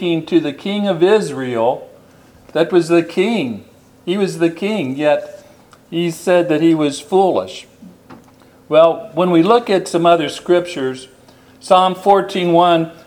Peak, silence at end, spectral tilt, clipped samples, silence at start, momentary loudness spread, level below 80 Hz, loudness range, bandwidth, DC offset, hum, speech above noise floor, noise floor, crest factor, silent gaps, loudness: 0 dBFS; 0.15 s; -6 dB/octave; under 0.1%; 0 s; 12 LU; -62 dBFS; 3 LU; 14.5 kHz; under 0.1%; none; 31 dB; -46 dBFS; 16 dB; none; -15 LUFS